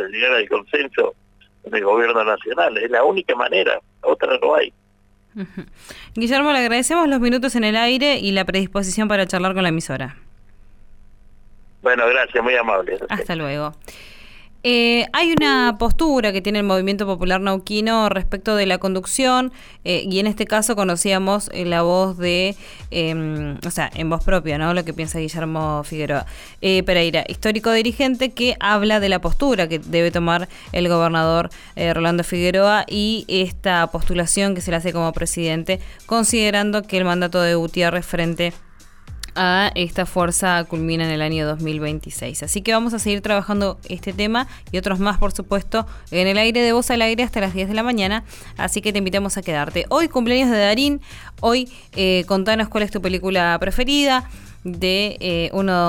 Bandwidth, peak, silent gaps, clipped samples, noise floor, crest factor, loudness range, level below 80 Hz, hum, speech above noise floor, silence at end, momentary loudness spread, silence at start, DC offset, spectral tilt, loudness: 19 kHz; -4 dBFS; none; under 0.1%; -55 dBFS; 14 dB; 3 LU; -34 dBFS; none; 36 dB; 0 s; 9 LU; 0 s; under 0.1%; -4 dB/octave; -19 LUFS